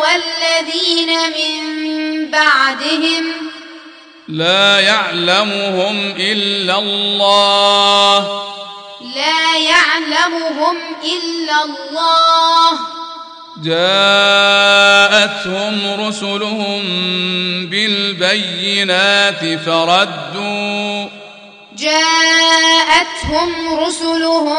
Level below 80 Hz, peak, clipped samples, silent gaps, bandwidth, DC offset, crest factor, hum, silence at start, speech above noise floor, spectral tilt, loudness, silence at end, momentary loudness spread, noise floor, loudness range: -48 dBFS; 0 dBFS; under 0.1%; none; 10.5 kHz; under 0.1%; 14 dB; none; 0 s; 25 dB; -2.5 dB/octave; -12 LUFS; 0 s; 12 LU; -38 dBFS; 4 LU